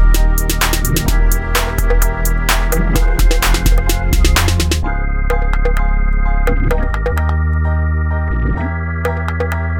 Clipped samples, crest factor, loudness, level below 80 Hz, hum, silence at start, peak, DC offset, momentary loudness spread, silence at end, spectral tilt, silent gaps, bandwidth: under 0.1%; 12 dB; -16 LUFS; -14 dBFS; none; 0 s; 0 dBFS; under 0.1%; 4 LU; 0 s; -4.5 dB/octave; none; 17.5 kHz